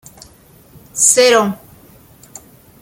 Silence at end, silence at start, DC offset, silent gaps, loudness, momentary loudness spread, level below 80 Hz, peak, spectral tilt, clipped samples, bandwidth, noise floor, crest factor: 1.25 s; 0.95 s; under 0.1%; none; -11 LUFS; 20 LU; -56 dBFS; 0 dBFS; -1.5 dB/octave; under 0.1%; 17 kHz; -45 dBFS; 18 dB